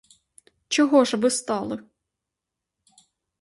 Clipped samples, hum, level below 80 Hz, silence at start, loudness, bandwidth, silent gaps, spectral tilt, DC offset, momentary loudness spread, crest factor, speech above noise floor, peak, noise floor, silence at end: under 0.1%; none; -68 dBFS; 0.7 s; -22 LUFS; 11.5 kHz; none; -3 dB/octave; under 0.1%; 13 LU; 22 dB; 64 dB; -4 dBFS; -85 dBFS; 1.6 s